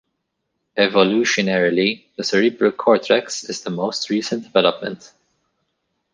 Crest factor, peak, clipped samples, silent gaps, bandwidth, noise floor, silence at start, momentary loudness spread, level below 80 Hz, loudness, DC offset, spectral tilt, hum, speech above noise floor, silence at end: 18 dB; -2 dBFS; under 0.1%; none; 10 kHz; -75 dBFS; 0.75 s; 11 LU; -66 dBFS; -19 LUFS; under 0.1%; -4 dB/octave; none; 56 dB; 1.15 s